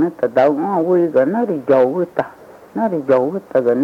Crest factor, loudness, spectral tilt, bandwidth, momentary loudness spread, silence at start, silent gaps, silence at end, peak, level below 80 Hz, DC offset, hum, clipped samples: 12 dB; -16 LUFS; -9 dB/octave; 6.8 kHz; 8 LU; 0 s; none; 0 s; -4 dBFS; -64 dBFS; under 0.1%; none; under 0.1%